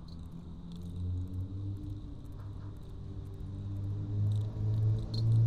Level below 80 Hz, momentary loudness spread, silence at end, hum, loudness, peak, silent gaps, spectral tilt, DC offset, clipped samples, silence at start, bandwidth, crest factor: -48 dBFS; 15 LU; 0 s; none; -37 LUFS; -20 dBFS; none; -9 dB/octave; 0.2%; under 0.1%; 0 s; 4.8 kHz; 14 dB